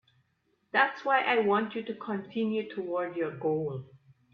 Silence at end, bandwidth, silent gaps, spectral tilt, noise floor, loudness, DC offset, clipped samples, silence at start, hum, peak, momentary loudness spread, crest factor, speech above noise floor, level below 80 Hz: 0.4 s; 6.6 kHz; none; -7.5 dB/octave; -74 dBFS; -30 LUFS; under 0.1%; under 0.1%; 0.75 s; none; -10 dBFS; 10 LU; 20 dB; 44 dB; -76 dBFS